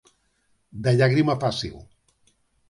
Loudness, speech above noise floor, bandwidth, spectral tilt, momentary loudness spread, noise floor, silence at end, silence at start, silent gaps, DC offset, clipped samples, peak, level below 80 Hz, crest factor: -22 LUFS; 46 dB; 11.5 kHz; -6.5 dB/octave; 15 LU; -68 dBFS; 0.85 s; 0.75 s; none; under 0.1%; under 0.1%; -8 dBFS; -54 dBFS; 18 dB